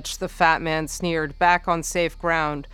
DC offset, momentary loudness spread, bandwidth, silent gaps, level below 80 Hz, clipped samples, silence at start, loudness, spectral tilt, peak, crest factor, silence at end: under 0.1%; 6 LU; 18 kHz; none; -40 dBFS; under 0.1%; 0 s; -22 LUFS; -4 dB/octave; -2 dBFS; 20 dB; 0 s